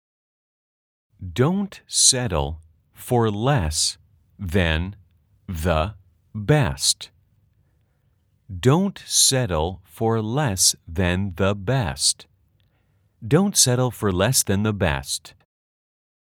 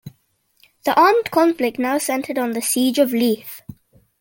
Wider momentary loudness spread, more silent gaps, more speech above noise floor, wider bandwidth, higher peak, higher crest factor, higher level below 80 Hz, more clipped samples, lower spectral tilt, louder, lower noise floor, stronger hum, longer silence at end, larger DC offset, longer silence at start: first, 16 LU vs 12 LU; neither; about the same, 43 dB vs 45 dB; first, over 20 kHz vs 17 kHz; about the same, -2 dBFS vs -2 dBFS; about the same, 22 dB vs 18 dB; first, -42 dBFS vs -64 dBFS; neither; about the same, -3.5 dB/octave vs -3 dB/octave; second, -21 LUFS vs -18 LUFS; about the same, -65 dBFS vs -63 dBFS; neither; first, 1.05 s vs 0.5 s; neither; first, 1.2 s vs 0.05 s